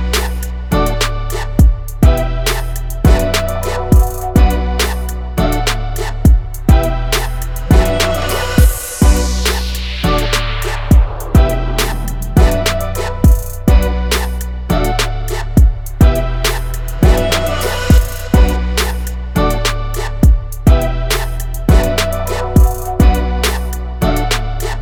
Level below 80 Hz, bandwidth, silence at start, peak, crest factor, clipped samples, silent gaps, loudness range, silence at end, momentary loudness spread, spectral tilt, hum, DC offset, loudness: -14 dBFS; 19 kHz; 0 s; 0 dBFS; 12 dB; under 0.1%; none; 1 LU; 0 s; 8 LU; -5 dB/octave; none; under 0.1%; -15 LUFS